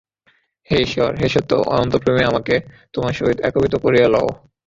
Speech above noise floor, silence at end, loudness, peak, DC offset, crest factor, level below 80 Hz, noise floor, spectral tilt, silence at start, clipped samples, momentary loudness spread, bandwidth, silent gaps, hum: 44 dB; 0.3 s; -18 LUFS; -2 dBFS; under 0.1%; 16 dB; -42 dBFS; -61 dBFS; -6.5 dB/octave; 0.7 s; under 0.1%; 7 LU; 7.8 kHz; none; none